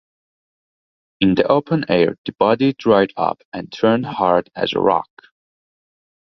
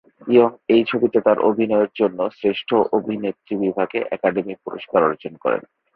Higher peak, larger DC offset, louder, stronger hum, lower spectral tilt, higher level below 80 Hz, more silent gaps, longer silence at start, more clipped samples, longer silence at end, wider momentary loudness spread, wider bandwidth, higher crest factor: about the same, -2 dBFS vs -2 dBFS; neither; about the same, -18 LUFS vs -20 LUFS; neither; second, -7.5 dB/octave vs -9.5 dB/octave; first, -54 dBFS vs -62 dBFS; first, 2.18-2.24 s, 3.45-3.52 s vs none; first, 1.2 s vs 0.25 s; neither; first, 1.25 s vs 0.35 s; about the same, 7 LU vs 9 LU; first, 6.2 kHz vs 5 kHz; about the same, 18 dB vs 18 dB